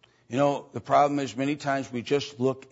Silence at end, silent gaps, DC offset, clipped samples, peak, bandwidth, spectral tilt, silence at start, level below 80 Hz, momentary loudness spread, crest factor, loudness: 0.1 s; none; under 0.1%; under 0.1%; -8 dBFS; 8 kHz; -5.5 dB/octave; 0.3 s; -70 dBFS; 7 LU; 18 dB; -27 LUFS